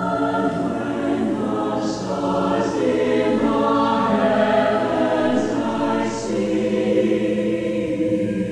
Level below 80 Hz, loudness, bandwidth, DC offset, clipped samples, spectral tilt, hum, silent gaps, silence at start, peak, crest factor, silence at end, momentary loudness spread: -50 dBFS; -20 LUFS; 11 kHz; under 0.1%; under 0.1%; -6.5 dB/octave; 60 Hz at -40 dBFS; none; 0 s; -6 dBFS; 14 dB; 0 s; 5 LU